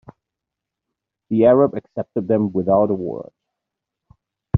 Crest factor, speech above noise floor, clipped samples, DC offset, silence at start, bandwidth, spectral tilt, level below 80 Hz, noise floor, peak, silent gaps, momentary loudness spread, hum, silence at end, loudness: 18 dB; 66 dB; under 0.1%; under 0.1%; 1.3 s; 3.9 kHz; -9.5 dB/octave; -56 dBFS; -84 dBFS; -2 dBFS; none; 14 LU; none; 0 s; -18 LUFS